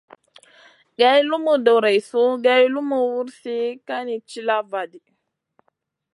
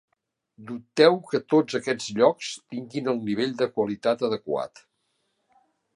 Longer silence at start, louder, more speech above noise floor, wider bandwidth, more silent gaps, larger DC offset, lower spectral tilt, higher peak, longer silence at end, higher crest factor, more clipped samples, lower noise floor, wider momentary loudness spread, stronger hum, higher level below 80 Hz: first, 1 s vs 0.6 s; first, -20 LUFS vs -25 LUFS; about the same, 52 dB vs 50 dB; about the same, 11.5 kHz vs 11 kHz; neither; neither; about the same, -4 dB/octave vs -5 dB/octave; about the same, -2 dBFS vs -4 dBFS; second, 1.15 s vs 1.3 s; about the same, 18 dB vs 22 dB; neither; about the same, -71 dBFS vs -74 dBFS; about the same, 13 LU vs 14 LU; neither; second, -80 dBFS vs -72 dBFS